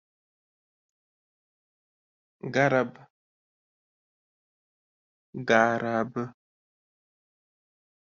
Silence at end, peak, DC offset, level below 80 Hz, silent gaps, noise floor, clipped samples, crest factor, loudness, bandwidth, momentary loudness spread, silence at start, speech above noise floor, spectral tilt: 1.85 s; -6 dBFS; under 0.1%; -74 dBFS; 3.10-5.33 s; under -90 dBFS; under 0.1%; 26 dB; -26 LUFS; 7.4 kHz; 17 LU; 2.45 s; over 65 dB; -4.5 dB/octave